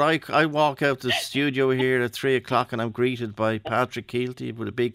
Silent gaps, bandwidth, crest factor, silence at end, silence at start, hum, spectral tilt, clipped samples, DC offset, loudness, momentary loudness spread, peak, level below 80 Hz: none; 16 kHz; 16 dB; 0 s; 0 s; none; -5.5 dB/octave; under 0.1%; under 0.1%; -24 LUFS; 7 LU; -8 dBFS; -62 dBFS